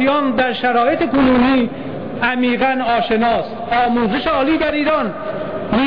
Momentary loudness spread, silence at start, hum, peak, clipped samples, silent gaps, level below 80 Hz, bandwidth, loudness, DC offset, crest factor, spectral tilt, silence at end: 9 LU; 0 s; none; -4 dBFS; under 0.1%; none; -42 dBFS; 5.2 kHz; -16 LUFS; 1%; 12 dB; -8 dB/octave; 0 s